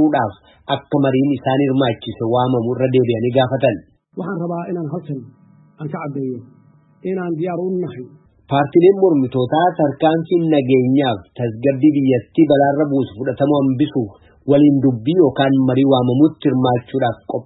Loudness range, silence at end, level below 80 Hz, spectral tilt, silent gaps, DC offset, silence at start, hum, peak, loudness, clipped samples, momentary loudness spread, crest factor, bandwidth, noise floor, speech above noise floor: 10 LU; 0.05 s; -56 dBFS; -12.5 dB/octave; none; under 0.1%; 0 s; none; -2 dBFS; -17 LUFS; under 0.1%; 13 LU; 14 dB; 4.1 kHz; -50 dBFS; 34 dB